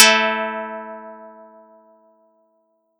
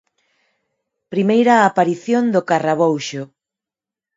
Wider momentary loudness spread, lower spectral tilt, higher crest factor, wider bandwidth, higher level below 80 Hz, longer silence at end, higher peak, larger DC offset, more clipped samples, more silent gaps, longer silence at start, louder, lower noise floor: first, 26 LU vs 14 LU; second, 0 dB/octave vs -6 dB/octave; about the same, 22 dB vs 18 dB; first, 18 kHz vs 7.8 kHz; second, under -90 dBFS vs -68 dBFS; first, 1.7 s vs 0.9 s; about the same, 0 dBFS vs 0 dBFS; neither; neither; neither; second, 0 s vs 1.1 s; second, -19 LUFS vs -16 LUFS; second, -66 dBFS vs -88 dBFS